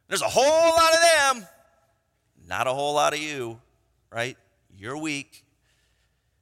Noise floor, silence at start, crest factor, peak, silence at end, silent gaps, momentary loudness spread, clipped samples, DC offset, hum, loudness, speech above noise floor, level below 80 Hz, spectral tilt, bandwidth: -70 dBFS; 0.1 s; 20 dB; -4 dBFS; 1.2 s; none; 18 LU; under 0.1%; under 0.1%; none; -22 LUFS; 47 dB; -62 dBFS; -2 dB/octave; 16.5 kHz